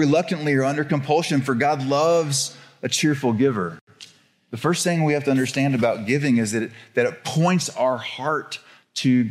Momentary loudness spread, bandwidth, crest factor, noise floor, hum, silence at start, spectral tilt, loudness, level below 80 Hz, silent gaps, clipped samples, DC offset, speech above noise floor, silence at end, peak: 8 LU; 15 kHz; 16 dB; -49 dBFS; none; 0 s; -5 dB/octave; -21 LUFS; -68 dBFS; 3.81-3.87 s; under 0.1%; under 0.1%; 28 dB; 0 s; -6 dBFS